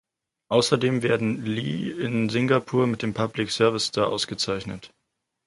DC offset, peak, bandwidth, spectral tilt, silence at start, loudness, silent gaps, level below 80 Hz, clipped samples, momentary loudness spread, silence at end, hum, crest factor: under 0.1%; -4 dBFS; 11.5 kHz; -5 dB/octave; 0.5 s; -24 LUFS; none; -58 dBFS; under 0.1%; 6 LU; 0.6 s; none; 20 dB